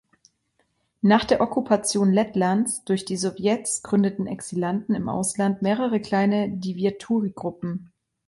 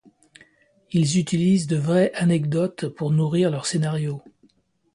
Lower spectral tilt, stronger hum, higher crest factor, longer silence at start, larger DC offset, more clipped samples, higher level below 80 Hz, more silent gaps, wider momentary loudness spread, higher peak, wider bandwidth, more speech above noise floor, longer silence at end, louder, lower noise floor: second, -5 dB/octave vs -6.5 dB/octave; neither; about the same, 18 dB vs 16 dB; first, 1.05 s vs 0.9 s; neither; neither; about the same, -60 dBFS vs -60 dBFS; neither; about the same, 9 LU vs 7 LU; about the same, -6 dBFS vs -8 dBFS; about the same, 11.5 kHz vs 11 kHz; first, 47 dB vs 41 dB; second, 0.45 s vs 0.75 s; about the same, -23 LUFS vs -22 LUFS; first, -70 dBFS vs -62 dBFS